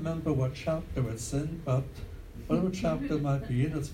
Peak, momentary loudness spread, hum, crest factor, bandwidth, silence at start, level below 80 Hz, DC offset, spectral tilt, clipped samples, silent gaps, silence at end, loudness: -14 dBFS; 8 LU; none; 16 dB; 15 kHz; 0 s; -46 dBFS; under 0.1%; -7 dB/octave; under 0.1%; none; 0 s; -31 LUFS